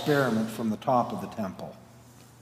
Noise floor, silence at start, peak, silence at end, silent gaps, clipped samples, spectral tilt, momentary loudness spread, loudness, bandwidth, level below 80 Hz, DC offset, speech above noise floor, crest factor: -52 dBFS; 0 s; -10 dBFS; 0.15 s; none; under 0.1%; -6 dB/octave; 14 LU; -28 LUFS; 16 kHz; -68 dBFS; under 0.1%; 24 dB; 18 dB